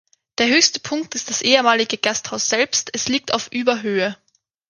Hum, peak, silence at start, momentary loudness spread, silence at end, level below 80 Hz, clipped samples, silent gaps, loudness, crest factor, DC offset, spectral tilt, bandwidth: none; 0 dBFS; 0.4 s; 10 LU; 0.55 s; -64 dBFS; under 0.1%; none; -18 LUFS; 20 dB; under 0.1%; -1.5 dB/octave; 11 kHz